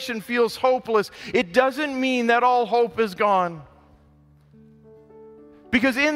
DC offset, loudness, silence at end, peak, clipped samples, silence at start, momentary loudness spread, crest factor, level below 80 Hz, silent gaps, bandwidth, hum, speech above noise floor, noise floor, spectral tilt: under 0.1%; -21 LUFS; 0 s; -4 dBFS; under 0.1%; 0 s; 6 LU; 18 dB; -58 dBFS; none; 16 kHz; none; 33 dB; -55 dBFS; -4.5 dB/octave